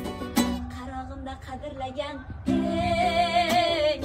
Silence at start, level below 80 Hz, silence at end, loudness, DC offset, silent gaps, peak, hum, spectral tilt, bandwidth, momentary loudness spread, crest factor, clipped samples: 0 s; -42 dBFS; 0 s; -26 LUFS; under 0.1%; none; -10 dBFS; none; -4.5 dB/octave; 16 kHz; 15 LU; 18 dB; under 0.1%